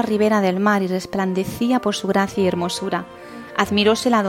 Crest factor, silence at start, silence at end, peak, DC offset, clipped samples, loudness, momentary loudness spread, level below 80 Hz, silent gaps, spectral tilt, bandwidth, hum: 18 dB; 0 s; 0 s; -2 dBFS; under 0.1%; under 0.1%; -20 LUFS; 9 LU; -54 dBFS; none; -5 dB/octave; 16.5 kHz; none